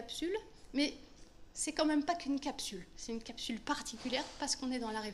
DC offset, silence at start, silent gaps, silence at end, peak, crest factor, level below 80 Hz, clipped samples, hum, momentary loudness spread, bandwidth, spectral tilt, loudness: under 0.1%; 0 s; none; 0 s; -18 dBFS; 20 dB; -60 dBFS; under 0.1%; none; 10 LU; 13 kHz; -2.5 dB/octave; -38 LUFS